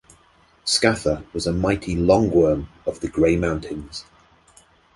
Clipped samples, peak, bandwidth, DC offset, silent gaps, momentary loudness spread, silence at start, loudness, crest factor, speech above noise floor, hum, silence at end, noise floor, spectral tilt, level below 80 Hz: under 0.1%; -2 dBFS; 11.5 kHz; under 0.1%; none; 13 LU; 0.65 s; -21 LUFS; 20 dB; 36 dB; none; 0.95 s; -56 dBFS; -5 dB/octave; -38 dBFS